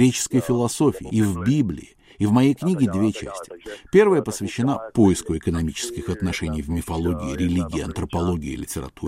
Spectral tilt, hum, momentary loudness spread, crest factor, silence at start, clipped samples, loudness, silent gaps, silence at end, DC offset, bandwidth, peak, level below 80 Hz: -6 dB/octave; none; 10 LU; 18 dB; 0 s; under 0.1%; -22 LUFS; none; 0 s; under 0.1%; 16 kHz; -4 dBFS; -40 dBFS